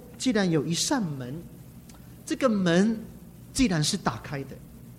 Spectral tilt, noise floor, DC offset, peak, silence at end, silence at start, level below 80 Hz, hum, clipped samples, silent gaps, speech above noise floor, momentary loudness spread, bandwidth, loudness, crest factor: -4.5 dB/octave; -47 dBFS; under 0.1%; -10 dBFS; 0 s; 0 s; -50 dBFS; none; under 0.1%; none; 21 dB; 23 LU; 16 kHz; -26 LUFS; 18 dB